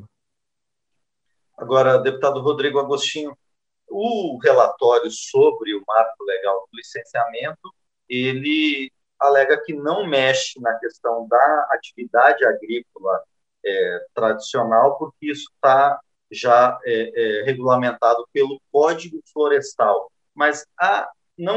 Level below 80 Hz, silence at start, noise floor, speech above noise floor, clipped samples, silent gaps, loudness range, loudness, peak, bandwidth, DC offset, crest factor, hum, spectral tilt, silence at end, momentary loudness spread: -74 dBFS; 1.6 s; -84 dBFS; 65 dB; under 0.1%; none; 3 LU; -19 LUFS; -2 dBFS; 8.6 kHz; under 0.1%; 18 dB; none; -4 dB/octave; 0 s; 13 LU